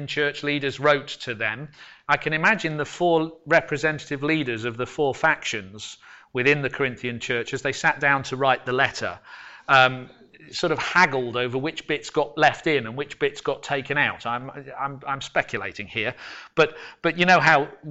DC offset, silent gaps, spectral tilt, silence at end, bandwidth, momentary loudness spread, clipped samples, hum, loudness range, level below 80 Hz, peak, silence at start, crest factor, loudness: under 0.1%; none; -4.5 dB/octave; 0 s; 8.2 kHz; 13 LU; under 0.1%; none; 4 LU; -58 dBFS; -6 dBFS; 0 s; 18 dB; -23 LUFS